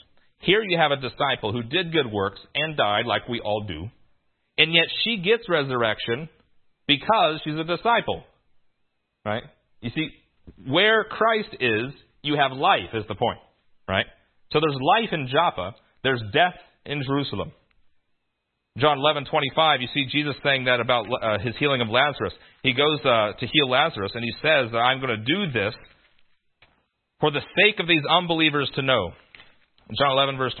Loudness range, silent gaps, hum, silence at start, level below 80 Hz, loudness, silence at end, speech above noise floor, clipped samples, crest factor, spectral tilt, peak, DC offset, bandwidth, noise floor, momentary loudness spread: 4 LU; none; none; 0.45 s; -56 dBFS; -22 LUFS; 0 s; 54 dB; under 0.1%; 24 dB; -9.5 dB/octave; 0 dBFS; under 0.1%; 4.5 kHz; -77 dBFS; 13 LU